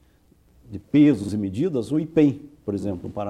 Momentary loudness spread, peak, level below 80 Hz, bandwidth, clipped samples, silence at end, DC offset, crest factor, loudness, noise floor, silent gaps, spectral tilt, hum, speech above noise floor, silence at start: 15 LU; -6 dBFS; -56 dBFS; 10.5 kHz; under 0.1%; 0 s; under 0.1%; 16 dB; -22 LUFS; -58 dBFS; none; -8 dB/octave; none; 36 dB; 0.7 s